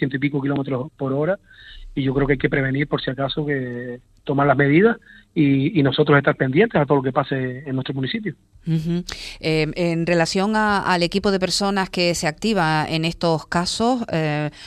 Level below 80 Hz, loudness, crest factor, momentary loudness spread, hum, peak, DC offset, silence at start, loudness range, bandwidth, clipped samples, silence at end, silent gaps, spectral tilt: -46 dBFS; -20 LUFS; 18 dB; 10 LU; none; -2 dBFS; under 0.1%; 0 s; 5 LU; 13.5 kHz; under 0.1%; 0 s; none; -5.5 dB/octave